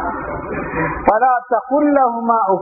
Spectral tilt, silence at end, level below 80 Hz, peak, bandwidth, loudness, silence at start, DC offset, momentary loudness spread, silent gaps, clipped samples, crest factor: -11.5 dB/octave; 0 s; -40 dBFS; 0 dBFS; 2.7 kHz; -17 LUFS; 0 s; under 0.1%; 10 LU; none; under 0.1%; 16 dB